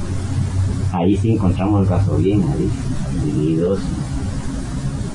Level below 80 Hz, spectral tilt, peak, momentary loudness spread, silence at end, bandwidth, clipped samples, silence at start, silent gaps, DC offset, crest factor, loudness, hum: -30 dBFS; -8 dB/octave; -4 dBFS; 8 LU; 0 s; 11 kHz; under 0.1%; 0 s; none; under 0.1%; 14 dB; -19 LUFS; none